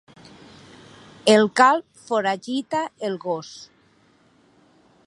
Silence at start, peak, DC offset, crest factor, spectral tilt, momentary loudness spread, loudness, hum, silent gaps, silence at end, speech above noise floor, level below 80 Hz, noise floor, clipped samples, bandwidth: 1.25 s; 0 dBFS; under 0.1%; 24 dB; -4 dB/octave; 13 LU; -21 LUFS; none; none; 1.45 s; 38 dB; -70 dBFS; -59 dBFS; under 0.1%; 11.5 kHz